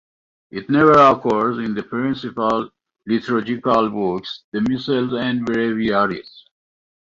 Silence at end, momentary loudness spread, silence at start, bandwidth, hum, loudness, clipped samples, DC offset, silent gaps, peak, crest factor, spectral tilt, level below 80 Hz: 0.6 s; 15 LU; 0.55 s; 7.4 kHz; none; -19 LUFS; under 0.1%; under 0.1%; 4.44-4.52 s; -2 dBFS; 18 dB; -7 dB/octave; -54 dBFS